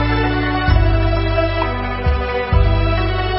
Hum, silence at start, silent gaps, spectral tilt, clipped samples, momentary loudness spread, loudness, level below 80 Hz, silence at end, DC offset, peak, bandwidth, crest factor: none; 0 s; none; -11.5 dB/octave; under 0.1%; 4 LU; -17 LUFS; -20 dBFS; 0 s; under 0.1%; -2 dBFS; 5.8 kHz; 14 dB